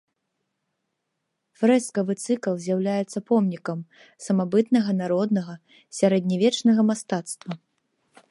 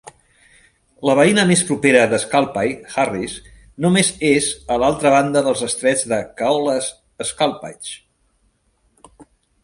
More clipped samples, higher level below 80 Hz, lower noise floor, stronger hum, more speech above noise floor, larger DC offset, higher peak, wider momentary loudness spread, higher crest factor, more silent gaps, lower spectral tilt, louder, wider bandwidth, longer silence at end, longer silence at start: neither; second, -76 dBFS vs -50 dBFS; first, -79 dBFS vs -63 dBFS; neither; first, 56 dB vs 45 dB; neither; second, -6 dBFS vs 0 dBFS; about the same, 15 LU vs 14 LU; about the same, 18 dB vs 18 dB; neither; first, -6 dB/octave vs -4 dB/octave; second, -23 LUFS vs -17 LUFS; about the same, 11.5 kHz vs 11.5 kHz; first, 0.75 s vs 0.4 s; first, 1.6 s vs 0.05 s